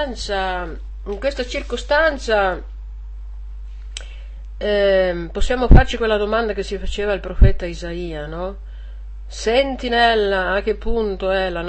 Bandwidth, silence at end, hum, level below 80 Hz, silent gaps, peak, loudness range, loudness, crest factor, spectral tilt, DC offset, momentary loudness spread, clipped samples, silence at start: 8.6 kHz; 0 s; none; -22 dBFS; none; 0 dBFS; 4 LU; -19 LUFS; 18 dB; -5.5 dB/octave; 0.4%; 21 LU; under 0.1%; 0 s